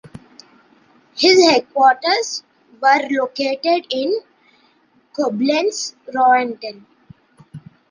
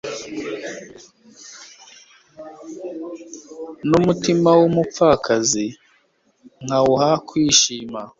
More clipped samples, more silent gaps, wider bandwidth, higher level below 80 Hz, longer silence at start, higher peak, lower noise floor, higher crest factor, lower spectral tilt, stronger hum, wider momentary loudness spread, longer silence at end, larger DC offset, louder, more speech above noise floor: neither; neither; first, 10 kHz vs 7.8 kHz; second, -66 dBFS vs -54 dBFS; about the same, 0.05 s vs 0.05 s; about the same, -2 dBFS vs 0 dBFS; second, -57 dBFS vs -61 dBFS; about the same, 18 dB vs 20 dB; second, -2.5 dB/octave vs -4 dB/octave; neither; second, 14 LU vs 23 LU; first, 0.3 s vs 0.1 s; neither; about the same, -17 LUFS vs -18 LUFS; about the same, 41 dB vs 44 dB